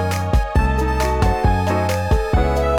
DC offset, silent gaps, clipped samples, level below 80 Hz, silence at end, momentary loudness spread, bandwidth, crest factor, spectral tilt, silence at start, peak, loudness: 0.6%; none; under 0.1%; -22 dBFS; 0 s; 2 LU; 18 kHz; 12 dB; -6.5 dB/octave; 0 s; -4 dBFS; -19 LUFS